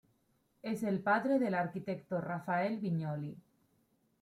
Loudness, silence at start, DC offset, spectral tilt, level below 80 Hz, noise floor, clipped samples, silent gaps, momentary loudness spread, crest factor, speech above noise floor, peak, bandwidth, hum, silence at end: -35 LUFS; 0.65 s; under 0.1%; -8 dB/octave; -78 dBFS; -75 dBFS; under 0.1%; none; 10 LU; 18 dB; 41 dB; -18 dBFS; 15 kHz; none; 0.8 s